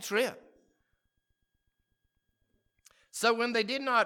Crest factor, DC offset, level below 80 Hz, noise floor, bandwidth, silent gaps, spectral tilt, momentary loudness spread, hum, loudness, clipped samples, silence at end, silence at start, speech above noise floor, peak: 22 dB; under 0.1%; -80 dBFS; -79 dBFS; 18 kHz; none; -2.5 dB/octave; 7 LU; none; -30 LUFS; under 0.1%; 0 s; 0 s; 49 dB; -12 dBFS